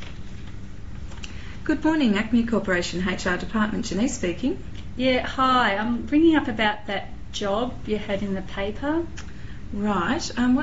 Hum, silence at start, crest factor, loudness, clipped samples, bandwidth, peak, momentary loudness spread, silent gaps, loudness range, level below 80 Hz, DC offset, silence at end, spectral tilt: none; 0 s; 18 dB; -24 LUFS; under 0.1%; 8 kHz; -6 dBFS; 19 LU; none; 5 LU; -40 dBFS; 2%; 0 s; -4 dB/octave